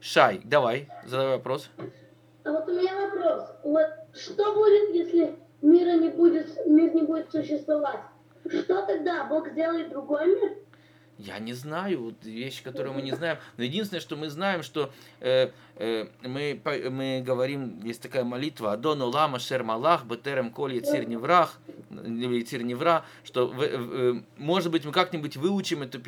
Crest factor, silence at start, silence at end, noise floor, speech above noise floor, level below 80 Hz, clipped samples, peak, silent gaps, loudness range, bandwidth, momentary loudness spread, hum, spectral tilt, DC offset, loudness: 24 dB; 0 s; 0 s; -56 dBFS; 30 dB; -78 dBFS; under 0.1%; -4 dBFS; none; 8 LU; 15 kHz; 14 LU; none; -6 dB/octave; under 0.1%; -27 LUFS